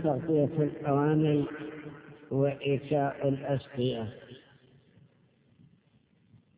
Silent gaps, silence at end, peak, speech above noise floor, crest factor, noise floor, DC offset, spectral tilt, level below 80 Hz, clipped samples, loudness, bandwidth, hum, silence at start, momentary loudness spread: none; 2.2 s; -14 dBFS; 37 dB; 16 dB; -66 dBFS; under 0.1%; -7 dB/octave; -64 dBFS; under 0.1%; -30 LUFS; 4 kHz; none; 0 s; 18 LU